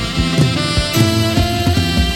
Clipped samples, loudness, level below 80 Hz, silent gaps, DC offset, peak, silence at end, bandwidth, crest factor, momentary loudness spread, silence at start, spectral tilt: under 0.1%; -15 LUFS; -24 dBFS; none; under 0.1%; 0 dBFS; 0 s; 16.5 kHz; 14 dB; 2 LU; 0 s; -5 dB/octave